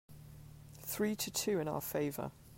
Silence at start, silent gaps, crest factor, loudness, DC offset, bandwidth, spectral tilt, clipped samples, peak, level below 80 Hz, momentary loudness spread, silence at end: 0.1 s; none; 16 dB; -37 LUFS; under 0.1%; 16.5 kHz; -4 dB/octave; under 0.1%; -22 dBFS; -64 dBFS; 20 LU; 0 s